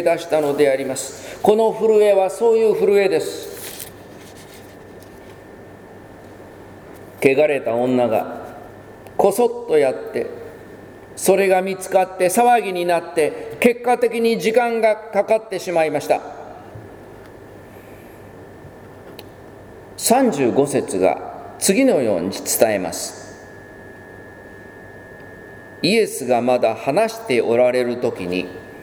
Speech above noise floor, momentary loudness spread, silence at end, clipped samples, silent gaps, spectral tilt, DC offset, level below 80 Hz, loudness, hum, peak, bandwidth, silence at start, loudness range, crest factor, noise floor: 23 dB; 24 LU; 0 s; under 0.1%; none; -4 dB/octave; under 0.1%; -56 dBFS; -18 LUFS; none; 0 dBFS; over 20 kHz; 0 s; 12 LU; 20 dB; -40 dBFS